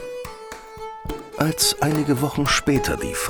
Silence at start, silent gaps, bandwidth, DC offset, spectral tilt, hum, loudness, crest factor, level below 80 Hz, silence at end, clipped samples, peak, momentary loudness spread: 0 s; none; over 20 kHz; under 0.1%; -4 dB/octave; none; -20 LUFS; 18 dB; -40 dBFS; 0 s; under 0.1%; -4 dBFS; 17 LU